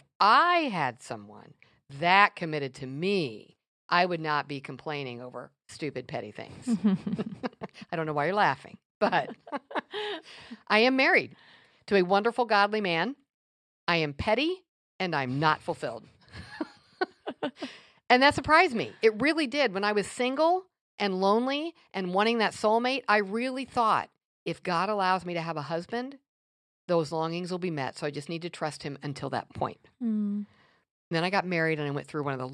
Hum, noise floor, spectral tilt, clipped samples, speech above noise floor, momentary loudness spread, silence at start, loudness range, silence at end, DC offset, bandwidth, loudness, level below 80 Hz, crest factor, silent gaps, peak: none; under -90 dBFS; -5.5 dB/octave; under 0.1%; over 62 dB; 17 LU; 0.2 s; 7 LU; 0 s; under 0.1%; 11 kHz; -28 LUFS; -64 dBFS; 24 dB; 3.68-3.89 s, 8.85-9.01 s, 13.34-13.87 s, 14.69-14.99 s, 20.81-20.98 s, 24.25-24.46 s, 26.29-26.88 s, 30.91-31.11 s; -6 dBFS